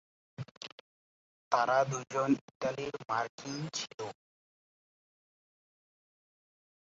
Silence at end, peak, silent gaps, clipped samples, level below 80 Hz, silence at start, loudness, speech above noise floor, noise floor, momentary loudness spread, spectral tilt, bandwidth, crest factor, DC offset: 2.7 s; -14 dBFS; 0.51-0.61 s, 0.72-1.51 s, 2.41-2.48 s, 2.55-2.60 s, 3.29-3.38 s, 3.94-3.98 s; under 0.1%; -76 dBFS; 0.4 s; -34 LUFS; over 57 dB; under -90 dBFS; 19 LU; -4 dB/octave; 7.6 kHz; 24 dB; under 0.1%